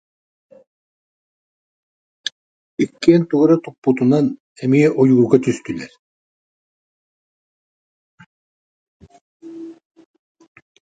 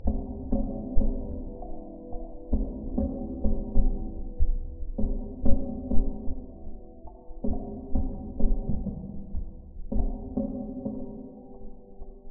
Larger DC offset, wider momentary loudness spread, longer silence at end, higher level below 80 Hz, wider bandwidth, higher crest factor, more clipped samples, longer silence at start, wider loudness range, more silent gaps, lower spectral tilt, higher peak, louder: neither; first, 22 LU vs 16 LU; first, 1.1 s vs 0 s; second, -62 dBFS vs -30 dBFS; first, 9.2 kHz vs 1.2 kHz; about the same, 20 dB vs 20 dB; neither; first, 2.8 s vs 0 s; first, 10 LU vs 3 LU; first, 3.78-3.82 s, 4.40-4.56 s, 5.99-8.18 s, 8.26-9.00 s, 9.21-9.40 s vs none; about the same, -7.5 dB/octave vs -8 dB/octave; first, 0 dBFS vs -6 dBFS; first, -17 LUFS vs -34 LUFS